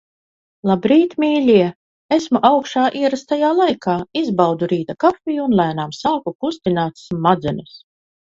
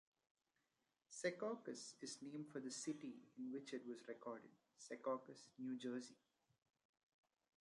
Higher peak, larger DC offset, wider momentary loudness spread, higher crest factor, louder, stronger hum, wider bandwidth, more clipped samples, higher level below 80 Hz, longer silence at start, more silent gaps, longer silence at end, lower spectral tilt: first, 0 dBFS vs -28 dBFS; neither; about the same, 8 LU vs 10 LU; second, 18 dB vs 24 dB; first, -17 LUFS vs -51 LUFS; neither; second, 7.8 kHz vs 11.5 kHz; neither; first, -54 dBFS vs under -90 dBFS; second, 0.65 s vs 1.1 s; first, 1.75-2.09 s, 6.35-6.39 s vs none; second, 0.55 s vs 1.45 s; first, -6.5 dB/octave vs -4 dB/octave